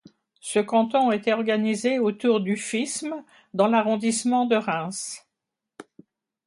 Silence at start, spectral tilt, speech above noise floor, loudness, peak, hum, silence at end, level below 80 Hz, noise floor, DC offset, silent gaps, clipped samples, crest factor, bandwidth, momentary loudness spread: 0.45 s; -4.5 dB/octave; 61 dB; -24 LUFS; -8 dBFS; none; 0.65 s; -74 dBFS; -85 dBFS; under 0.1%; none; under 0.1%; 16 dB; 11.5 kHz; 13 LU